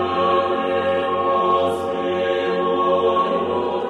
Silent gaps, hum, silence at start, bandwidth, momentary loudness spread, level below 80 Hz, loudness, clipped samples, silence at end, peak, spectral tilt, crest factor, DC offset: none; none; 0 s; 11.5 kHz; 4 LU; -58 dBFS; -19 LUFS; under 0.1%; 0 s; -6 dBFS; -6 dB/octave; 12 dB; under 0.1%